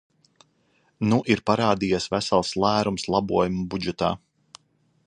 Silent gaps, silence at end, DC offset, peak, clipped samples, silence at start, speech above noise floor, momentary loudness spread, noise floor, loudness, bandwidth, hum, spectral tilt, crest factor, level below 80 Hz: none; 0.9 s; under 0.1%; -4 dBFS; under 0.1%; 1 s; 43 dB; 6 LU; -66 dBFS; -23 LUFS; 10.5 kHz; none; -5.5 dB/octave; 22 dB; -52 dBFS